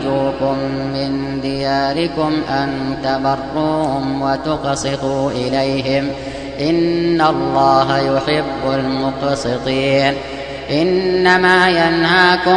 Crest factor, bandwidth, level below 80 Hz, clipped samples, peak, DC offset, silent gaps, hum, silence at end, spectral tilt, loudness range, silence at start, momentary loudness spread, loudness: 16 dB; 10 kHz; -40 dBFS; under 0.1%; 0 dBFS; 0.3%; none; none; 0 s; -5.5 dB/octave; 4 LU; 0 s; 9 LU; -16 LUFS